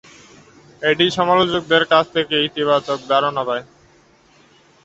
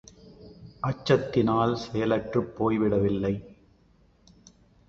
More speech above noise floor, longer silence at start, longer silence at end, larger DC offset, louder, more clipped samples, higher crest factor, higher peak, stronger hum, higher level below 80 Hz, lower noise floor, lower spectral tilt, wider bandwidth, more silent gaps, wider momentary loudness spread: about the same, 35 dB vs 36 dB; first, 0.8 s vs 0.25 s; second, 1.2 s vs 1.35 s; neither; first, -17 LUFS vs -26 LUFS; neither; about the same, 18 dB vs 20 dB; first, -2 dBFS vs -8 dBFS; neither; second, -58 dBFS vs -52 dBFS; second, -53 dBFS vs -61 dBFS; second, -4.5 dB/octave vs -7.5 dB/octave; about the same, 8.2 kHz vs 7.8 kHz; neither; about the same, 8 LU vs 8 LU